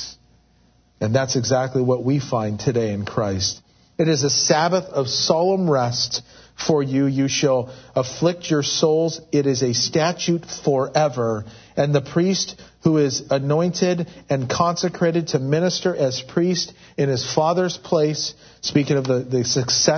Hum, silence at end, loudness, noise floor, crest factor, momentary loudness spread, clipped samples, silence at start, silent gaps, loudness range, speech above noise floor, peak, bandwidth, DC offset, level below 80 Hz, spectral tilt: none; 0 s; -20 LUFS; -57 dBFS; 18 dB; 7 LU; under 0.1%; 0 s; none; 2 LU; 37 dB; -2 dBFS; 6.6 kHz; under 0.1%; -56 dBFS; -4.5 dB/octave